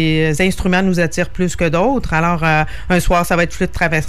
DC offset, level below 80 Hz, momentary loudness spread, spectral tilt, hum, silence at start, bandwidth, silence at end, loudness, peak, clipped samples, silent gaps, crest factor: 5%; -28 dBFS; 4 LU; -5.5 dB/octave; none; 0 s; 15 kHz; 0 s; -16 LUFS; -2 dBFS; under 0.1%; none; 12 dB